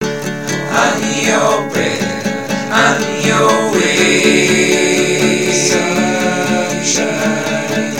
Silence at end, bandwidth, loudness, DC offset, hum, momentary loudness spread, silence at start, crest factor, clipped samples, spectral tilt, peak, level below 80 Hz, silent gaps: 0 s; 17 kHz; -13 LUFS; 0.9%; none; 7 LU; 0 s; 14 dB; under 0.1%; -3.5 dB/octave; 0 dBFS; -54 dBFS; none